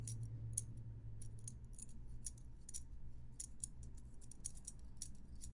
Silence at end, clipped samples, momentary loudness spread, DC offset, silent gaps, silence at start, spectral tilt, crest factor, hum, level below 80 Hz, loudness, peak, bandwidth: 0 s; under 0.1%; 13 LU; under 0.1%; none; 0 s; -4 dB/octave; 26 dB; none; -56 dBFS; -52 LUFS; -22 dBFS; 11.5 kHz